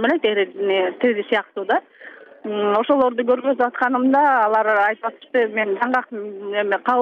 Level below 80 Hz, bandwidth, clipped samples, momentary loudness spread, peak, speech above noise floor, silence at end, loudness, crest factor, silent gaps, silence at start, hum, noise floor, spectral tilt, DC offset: -70 dBFS; 6.2 kHz; under 0.1%; 7 LU; -6 dBFS; 23 dB; 0 s; -19 LUFS; 14 dB; none; 0 s; none; -42 dBFS; -6.5 dB/octave; under 0.1%